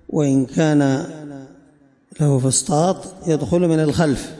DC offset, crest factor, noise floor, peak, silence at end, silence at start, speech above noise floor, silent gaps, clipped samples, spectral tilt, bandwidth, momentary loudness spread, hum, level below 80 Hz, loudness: under 0.1%; 14 dB; -53 dBFS; -4 dBFS; 0 s; 0.1 s; 36 dB; none; under 0.1%; -6 dB/octave; 11.5 kHz; 13 LU; none; -48 dBFS; -18 LUFS